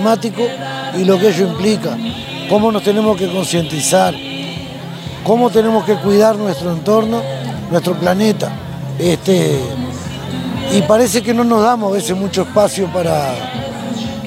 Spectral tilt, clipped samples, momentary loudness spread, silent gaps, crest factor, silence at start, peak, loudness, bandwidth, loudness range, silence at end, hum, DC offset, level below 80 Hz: -5 dB/octave; under 0.1%; 11 LU; none; 14 dB; 0 s; 0 dBFS; -15 LUFS; 16 kHz; 2 LU; 0 s; none; under 0.1%; -48 dBFS